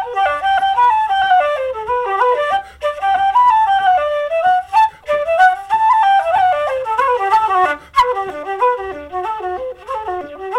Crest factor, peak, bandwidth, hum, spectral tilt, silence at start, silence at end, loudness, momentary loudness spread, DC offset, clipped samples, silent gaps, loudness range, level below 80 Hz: 14 dB; 0 dBFS; 12 kHz; none; -3 dB/octave; 0 s; 0 s; -15 LUFS; 11 LU; under 0.1%; under 0.1%; none; 3 LU; -48 dBFS